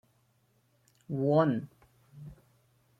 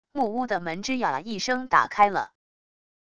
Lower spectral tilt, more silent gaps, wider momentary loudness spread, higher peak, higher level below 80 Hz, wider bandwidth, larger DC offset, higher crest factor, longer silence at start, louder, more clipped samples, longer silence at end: first, -9.5 dB/octave vs -3.5 dB/octave; neither; first, 25 LU vs 7 LU; second, -14 dBFS vs -6 dBFS; second, -68 dBFS vs -60 dBFS; second, 7.4 kHz vs 10 kHz; second, under 0.1% vs 0.4%; about the same, 20 dB vs 20 dB; first, 1.1 s vs 0.05 s; second, -29 LUFS vs -25 LUFS; neither; about the same, 0.65 s vs 0.7 s